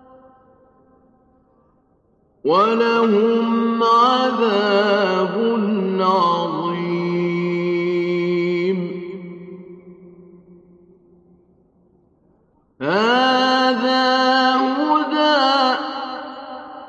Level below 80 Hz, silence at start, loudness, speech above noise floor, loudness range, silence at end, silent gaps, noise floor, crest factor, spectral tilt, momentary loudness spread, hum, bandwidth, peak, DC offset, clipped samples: -68 dBFS; 2.45 s; -18 LUFS; 43 dB; 9 LU; 0 s; none; -60 dBFS; 16 dB; -6 dB/octave; 14 LU; none; 8.2 kHz; -4 dBFS; under 0.1%; under 0.1%